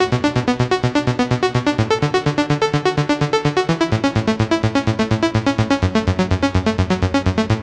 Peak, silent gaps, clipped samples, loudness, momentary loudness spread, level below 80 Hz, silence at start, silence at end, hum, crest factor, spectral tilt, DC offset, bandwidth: -2 dBFS; none; under 0.1%; -18 LUFS; 1 LU; -36 dBFS; 0 s; 0 s; none; 16 dB; -6 dB/octave; under 0.1%; 10.5 kHz